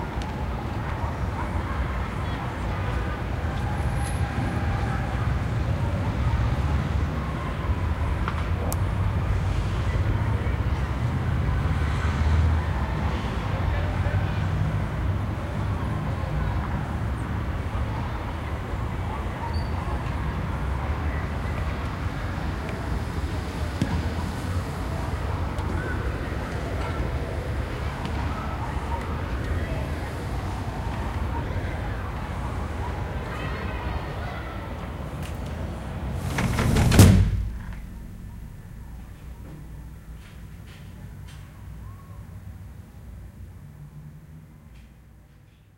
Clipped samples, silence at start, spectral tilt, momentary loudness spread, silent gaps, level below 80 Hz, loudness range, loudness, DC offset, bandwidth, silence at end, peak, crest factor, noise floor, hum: under 0.1%; 0 s; -6.5 dB/octave; 16 LU; none; -32 dBFS; 19 LU; -27 LUFS; under 0.1%; 16 kHz; 0.5 s; 0 dBFS; 26 dB; -52 dBFS; none